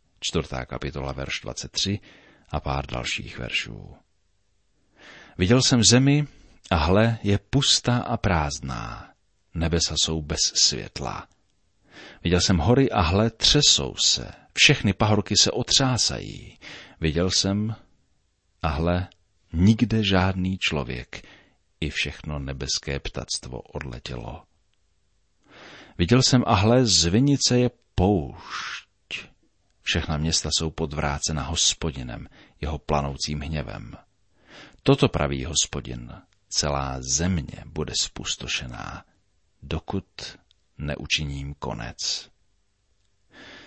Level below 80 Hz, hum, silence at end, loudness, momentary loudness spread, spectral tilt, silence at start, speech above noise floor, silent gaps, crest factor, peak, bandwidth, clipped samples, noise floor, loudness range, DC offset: -40 dBFS; none; 0.05 s; -23 LUFS; 17 LU; -3.5 dB/octave; 0.2 s; 46 dB; none; 22 dB; -4 dBFS; 8.8 kHz; under 0.1%; -70 dBFS; 10 LU; under 0.1%